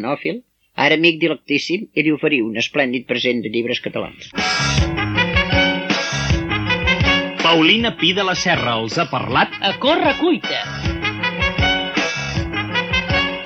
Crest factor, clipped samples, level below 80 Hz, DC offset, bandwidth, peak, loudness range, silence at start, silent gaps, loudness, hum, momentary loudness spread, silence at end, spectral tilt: 18 dB; under 0.1%; -34 dBFS; under 0.1%; 8.8 kHz; 0 dBFS; 3 LU; 0 s; none; -17 LUFS; none; 8 LU; 0 s; -4.5 dB/octave